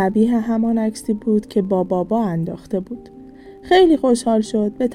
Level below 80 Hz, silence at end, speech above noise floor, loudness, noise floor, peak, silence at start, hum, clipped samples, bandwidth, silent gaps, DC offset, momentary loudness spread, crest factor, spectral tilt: -48 dBFS; 0 s; 22 dB; -18 LUFS; -40 dBFS; -4 dBFS; 0 s; none; under 0.1%; 12 kHz; none; under 0.1%; 12 LU; 14 dB; -6.5 dB/octave